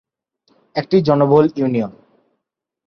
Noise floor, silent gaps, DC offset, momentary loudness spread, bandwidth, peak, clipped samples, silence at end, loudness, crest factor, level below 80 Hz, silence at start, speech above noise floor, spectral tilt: -79 dBFS; none; under 0.1%; 13 LU; 6.4 kHz; 0 dBFS; under 0.1%; 0.95 s; -16 LUFS; 18 dB; -56 dBFS; 0.75 s; 64 dB; -9 dB/octave